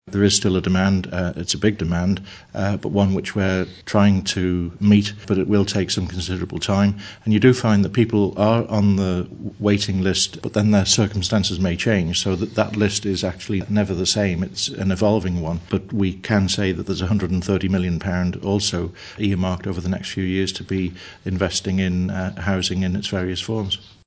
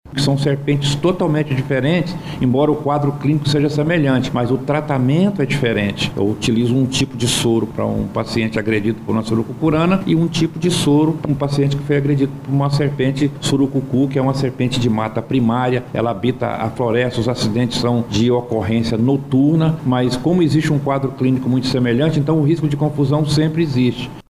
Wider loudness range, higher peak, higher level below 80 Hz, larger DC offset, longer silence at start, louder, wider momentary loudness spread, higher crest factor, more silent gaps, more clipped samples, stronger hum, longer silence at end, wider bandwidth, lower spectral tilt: about the same, 4 LU vs 2 LU; first, 0 dBFS vs -4 dBFS; first, -36 dBFS vs -44 dBFS; neither; about the same, 0.05 s vs 0.05 s; second, -21 LUFS vs -17 LUFS; first, 8 LU vs 4 LU; first, 20 dB vs 12 dB; neither; neither; neither; first, 0.25 s vs 0.1 s; second, 8 kHz vs 14 kHz; second, -5 dB/octave vs -6.5 dB/octave